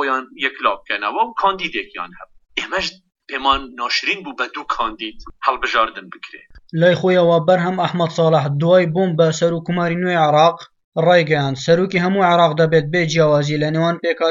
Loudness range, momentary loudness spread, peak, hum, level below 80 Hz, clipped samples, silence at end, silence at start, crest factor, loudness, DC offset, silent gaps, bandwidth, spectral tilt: 6 LU; 12 LU; -2 dBFS; none; -50 dBFS; under 0.1%; 0 s; 0 s; 16 dB; -17 LUFS; under 0.1%; 10.84-10.92 s; 7.6 kHz; -5.5 dB/octave